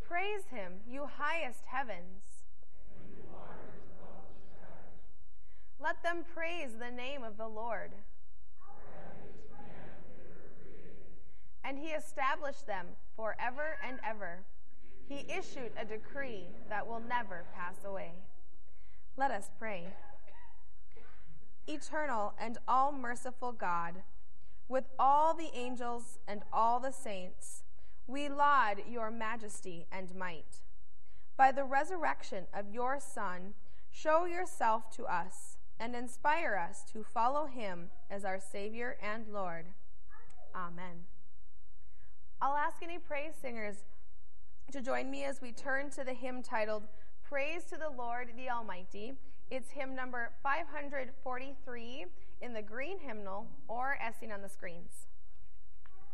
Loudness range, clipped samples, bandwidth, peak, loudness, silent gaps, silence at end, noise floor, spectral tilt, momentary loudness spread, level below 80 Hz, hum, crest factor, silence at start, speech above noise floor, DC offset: 10 LU; under 0.1%; 12 kHz; -14 dBFS; -38 LUFS; none; 0.1 s; -63 dBFS; -4.5 dB/octave; 22 LU; -64 dBFS; none; 26 dB; 0 s; 25 dB; 3%